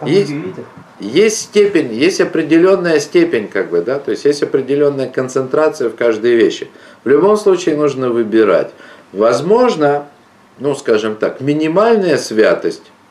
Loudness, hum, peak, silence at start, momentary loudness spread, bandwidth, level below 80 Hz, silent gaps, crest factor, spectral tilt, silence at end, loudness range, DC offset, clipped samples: -14 LUFS; none; -2 dBFS; 0 s; 9 LU; 12.5 kHz; -62 dBFS; none; 12 dB; -5 dB/octave; 0.3 s; 2 LU; under 0.1%; under 0.1%